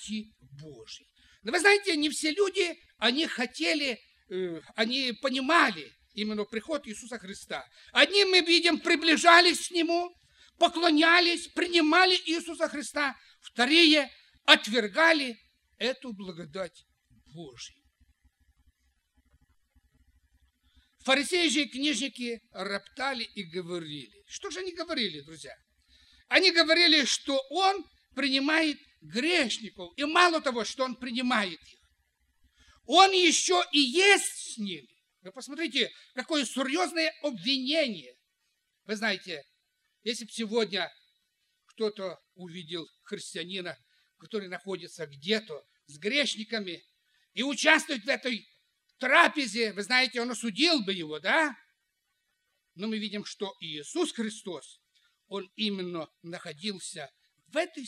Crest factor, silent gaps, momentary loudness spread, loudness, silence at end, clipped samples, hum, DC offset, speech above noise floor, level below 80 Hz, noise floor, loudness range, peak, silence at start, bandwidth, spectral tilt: 28 dB; none; 20 LU; -26 LUFS; 0 s; under 0.1%; none; under 0.1%; 51 dB; -72 dBFS; -79 dBFS; 13 LU; -2 dBFS; 0 s; 14 kHz; -2 dB/octave